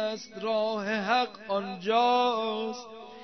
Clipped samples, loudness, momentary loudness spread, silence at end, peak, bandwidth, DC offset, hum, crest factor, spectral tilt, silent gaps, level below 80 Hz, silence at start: under 0.1%; -28 LUFS; 11 LU; 0 s; -12 dBFS; 6.4 kHz; under 0.1%; none; 16 dB; -4.5 dB/octave; none; -78 dBFS; 0 s